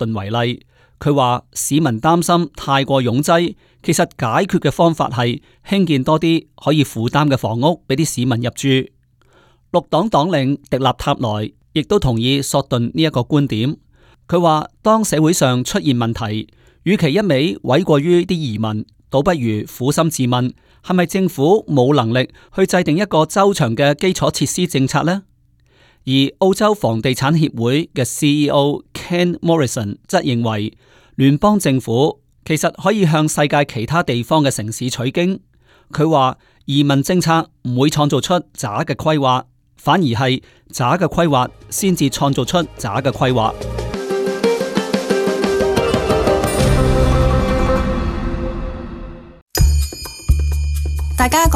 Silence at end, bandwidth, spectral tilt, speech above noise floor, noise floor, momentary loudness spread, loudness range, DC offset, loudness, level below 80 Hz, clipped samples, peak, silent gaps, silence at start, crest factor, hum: 0 s; 17 kHz; -5.5 dB/octave; 38 dB; -54 dBFS; 8 LU; 2 LU; under 0.1%; -17 LUFS; -30 dBFS; under 0.1%; -2 dBFS; 49.42-49.47 s; 0 s; 14 dB; none